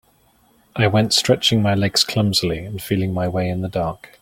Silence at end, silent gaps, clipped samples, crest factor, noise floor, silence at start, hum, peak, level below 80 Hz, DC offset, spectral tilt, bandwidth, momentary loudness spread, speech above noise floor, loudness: 0.15 s; none; under 0.1%; 18 dB; -57 dBFS; 0.75 s; none; -2 dBFS; -48 dBFS; under 0.1%; -4.5 dB/octave; 17 kHz; 9 LU; 38 dB; -19 LUFS